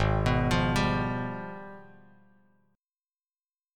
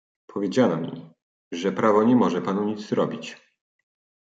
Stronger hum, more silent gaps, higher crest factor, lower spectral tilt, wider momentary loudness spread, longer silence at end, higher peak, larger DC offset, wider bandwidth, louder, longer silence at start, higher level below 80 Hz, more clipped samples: neither; second, none vs 1.22-1.51 s; about the same, 20 dB vs 20 dB; about the same, -6.5 dB/octave vs -6.5 dB/octave; about the same, 19 LU vs 17 LU; first, 1.95 s vs 1 s; second, -10 dBFS vs -6 dBFS; neither; first, 15.5 kHz vs 7.8 kHz; second, -28 LUFS vs -23 LUFS; second, 0 s vs 0.3 s; first, -40 dBFS vs -72 dBFS; neither